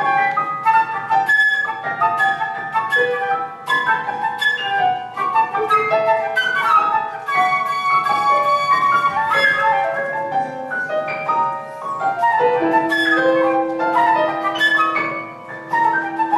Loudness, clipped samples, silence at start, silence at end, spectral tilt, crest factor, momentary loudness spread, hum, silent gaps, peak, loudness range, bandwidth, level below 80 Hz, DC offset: -17 LUFS; under 0.1%; 0 s; 0 s; -4 dB/octave; 14 dB; 7 LU; none; none; -4 dBFS; 3 LU; 13.5 kHz; -66 dBFS; under 0.1%